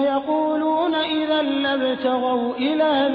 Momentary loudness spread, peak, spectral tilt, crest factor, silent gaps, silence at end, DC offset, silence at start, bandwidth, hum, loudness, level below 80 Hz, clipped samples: 2 LU; -10 dBFS; -7 dB/octave; 10 dB; none; 0 s; under 0.1%; 0 s; 5.2 kHz; none; -21 LUFS; -62 dBFS; under 0.1%